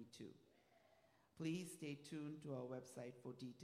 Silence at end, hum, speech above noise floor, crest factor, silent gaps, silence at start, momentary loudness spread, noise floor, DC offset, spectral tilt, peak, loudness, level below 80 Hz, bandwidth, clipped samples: 0 s; none; 25 dB; 18 dB; none; 0 s; 10 LU; -76 dBFS; under 0.1%; -5.5 dB/octave; -36 dBFS; -52 LUFS; under -90 dBFS; 15.5 kHz; under 0.1%